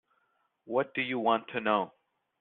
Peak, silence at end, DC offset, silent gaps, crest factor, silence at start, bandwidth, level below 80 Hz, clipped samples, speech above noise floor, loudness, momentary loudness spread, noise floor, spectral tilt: -12 dBFS; 0.55 s; under 0.1%; none; 20 dB; 0.65 s; 4.3 kHz; -78 dBFS; under 0.1%; 45 dB; -30 LUFS; 4 LU; -75 dBFS; -2.5 dB/octave